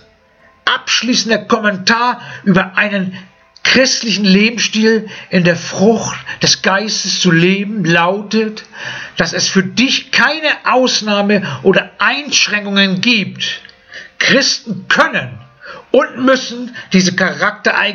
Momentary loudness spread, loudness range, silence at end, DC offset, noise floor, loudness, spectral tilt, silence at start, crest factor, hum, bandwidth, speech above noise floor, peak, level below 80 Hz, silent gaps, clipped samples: 9 LU; 2 LU; 0 s; under 0.1%; -49 dBFS; -13 LUFS; -3.5 dB/octave; 0.65 s; 14 dB; none; 7.4 kHz; 35 dB; 0 dBFS; -54 dBFS; none; under 0.1%